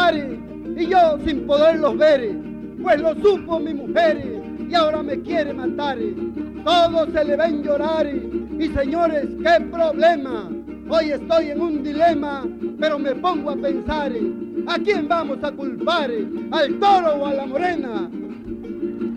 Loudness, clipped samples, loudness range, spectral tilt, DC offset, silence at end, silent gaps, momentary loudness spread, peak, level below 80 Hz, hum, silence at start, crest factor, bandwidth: -20 LUFS; under 0.1%; 4 LU; -6 dB/octave; under 0.1%; 0 s; none; 12 LU; -6 dBFS; -46 dBFS; none; 0 s; 14 dB; 9.4 kHz